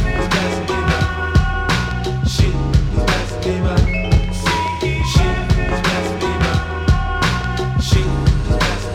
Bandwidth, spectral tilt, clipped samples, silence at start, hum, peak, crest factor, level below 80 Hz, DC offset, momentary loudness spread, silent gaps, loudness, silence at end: 15.5 kHz; -5.5 dB/octave; under 0.1%; 0 s; none; 0 dBFS; 16 dB; -20 dBFS; under 0.1%; 3 LU; none; -18 LUFS; 0 s